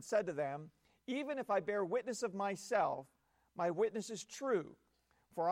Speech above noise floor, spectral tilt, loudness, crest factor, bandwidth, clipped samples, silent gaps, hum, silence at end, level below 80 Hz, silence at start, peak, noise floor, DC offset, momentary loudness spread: 36 dB; -4.5 dB/octave; -39 LUFS; 16 dB; 16 kHz; under 0.1%; none; none; 0 s; -82 dBFS; 0 s; -22 dBFS; -74 dBFS; under 0.1%; 13 LU